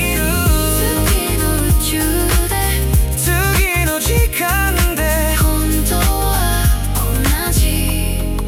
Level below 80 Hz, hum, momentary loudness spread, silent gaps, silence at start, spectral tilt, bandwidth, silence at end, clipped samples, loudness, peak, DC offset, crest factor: -18 dBFS; none; 2 LU; none; 0 s; -4 dB/octave; 17 kHz; 0 s; under 0.1%; -15 LUFS; -2 dBFS; 0.2%; 12 dB